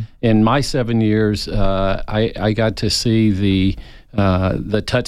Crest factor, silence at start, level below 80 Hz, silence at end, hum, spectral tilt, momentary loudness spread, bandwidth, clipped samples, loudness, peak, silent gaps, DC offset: 12 dB; 0 s; -30 dBFS; 0 s; none; -6 dB/octave; 5 LU; 13 kHz; under 0.1%; -17 LUFS; -4 dBFS; none; under 0.1%